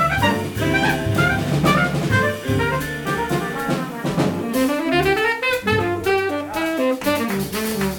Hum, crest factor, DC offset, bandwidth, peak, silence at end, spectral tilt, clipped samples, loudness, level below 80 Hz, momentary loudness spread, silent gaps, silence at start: none; 18 dB; under 0.1%; 18 kHz; -2 dBFS; 0 s; -5.5 dB/octave; under 0.1%; -20 LUFS; -40 dBFS; 6 LU; none; 0 s